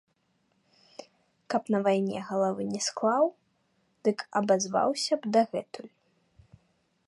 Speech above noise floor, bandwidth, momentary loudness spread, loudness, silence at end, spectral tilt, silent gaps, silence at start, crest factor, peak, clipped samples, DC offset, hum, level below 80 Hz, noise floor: 45 dB; 11.5 kHz; 16 LU; -28 LUFS; 1.2 s; -4.5 dB/octave; none; 1 s; 18 dB; -12 dBFS; under 0.1%; under 0.1%; none; -74 dBFS; -73 dBFS